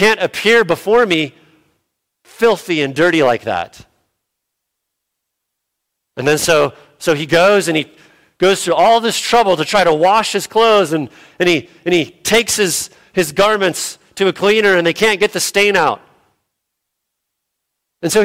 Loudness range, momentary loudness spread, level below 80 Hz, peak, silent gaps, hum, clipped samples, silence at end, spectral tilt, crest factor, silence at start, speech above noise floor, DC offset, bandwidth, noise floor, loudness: 6 LU; 10 LU; -52 dBFS; -2 dBFS; none; none; under 0.1%; 0 s; -3.5 dB/octave; 14 dB; 0 s; 63 dB; under 0.1%; 16.5 kHz; -76 dBFS; -14 LUFS